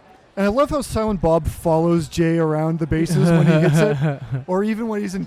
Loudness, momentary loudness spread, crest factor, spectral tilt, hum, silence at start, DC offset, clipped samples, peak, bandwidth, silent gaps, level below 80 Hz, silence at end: -19 LUFS; 8 LU; 16 dB; -7 dB/octave; none; 0.35 s; under 0.1%; under 0.1%; -2 dBFS; 14.5 kHz; none; -38 dBFS; 0 s